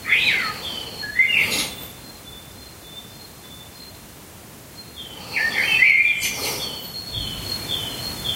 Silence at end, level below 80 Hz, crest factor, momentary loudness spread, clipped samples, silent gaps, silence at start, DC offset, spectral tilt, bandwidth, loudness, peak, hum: 0 s; -48 dBFS; 20 dB; 24 LU; under 0.1%; none; 0 s; under 0.1%; -1 dB/octave; 16 kHz; -20 LUFS; -4 dBFS; none